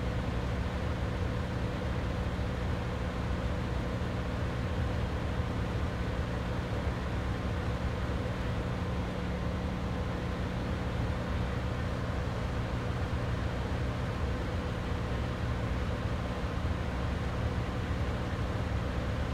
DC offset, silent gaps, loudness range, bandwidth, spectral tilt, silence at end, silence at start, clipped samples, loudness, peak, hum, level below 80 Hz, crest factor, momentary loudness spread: under 0.1%; none; 0 LU; 12.5 kHz; -7 dB/octave; 0 s; 0 s; under 0.1%; -34 LUFS; -20 dBFS; none; -38 dBFS; 12 dB; 1 LU